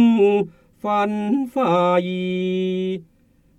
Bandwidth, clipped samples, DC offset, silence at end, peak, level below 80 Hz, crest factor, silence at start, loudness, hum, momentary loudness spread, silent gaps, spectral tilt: 8.8 kHz; under 0.1%; under 0.1%; 0.55 s; -6 dBFS; -62 dBFS; 14 dB; 0 s; -21 LUFS; none; 11 LU; none; -8 dB/octave